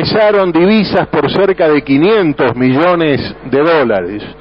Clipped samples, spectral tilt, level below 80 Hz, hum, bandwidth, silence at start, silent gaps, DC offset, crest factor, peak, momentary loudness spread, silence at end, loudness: under 0.1%; -9 dB/octave; -40 dBFS; none; 5.8 kHz; 0 s; none; 0.3%; 10 dB; 0 dBFS; 5 LU; 0.05 s; -11 LUFS